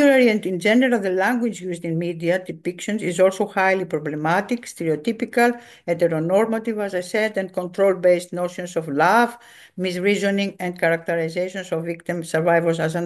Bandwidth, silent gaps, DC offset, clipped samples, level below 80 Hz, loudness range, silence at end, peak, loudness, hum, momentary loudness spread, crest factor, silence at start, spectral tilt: 12.5 kHz; none; under 0.1%; under 0.1%; -68 dBFS; 1 LU; 0 s; -4 dBFS; -21 LUFS; none; 10 LU; 16 dB; 0 s; -5.5 dB/octave